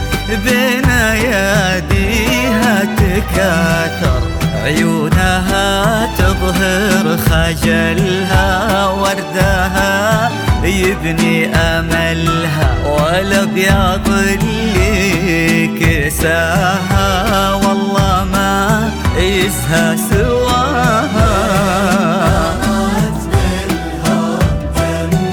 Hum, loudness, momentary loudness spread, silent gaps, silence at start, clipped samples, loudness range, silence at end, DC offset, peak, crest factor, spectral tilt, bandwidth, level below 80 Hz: none; -13 LUFS; 3 LU; none; 0 s; under 0.1%; 1 LU; 0 s; under 0.1%; 0 dBFS; 12 dB; -5 dB/octave; 19.5 kHz; -22 dBFS